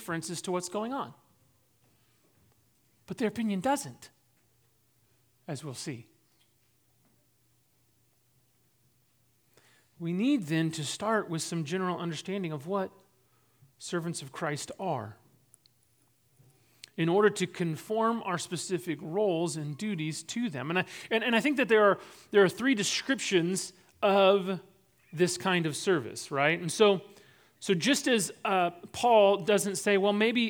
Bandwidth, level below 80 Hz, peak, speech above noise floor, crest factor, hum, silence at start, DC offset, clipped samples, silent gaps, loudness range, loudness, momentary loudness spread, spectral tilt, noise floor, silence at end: over 20 kHz; -76 dBFS; -10 dBFS; 41 dB; 20 dB; none; 0 s; under 0.1%; under 0.1%; none; 12 LU; -29 LUFS; 13 LU; -4.5 dB/octave; -70 dBFS; 0 s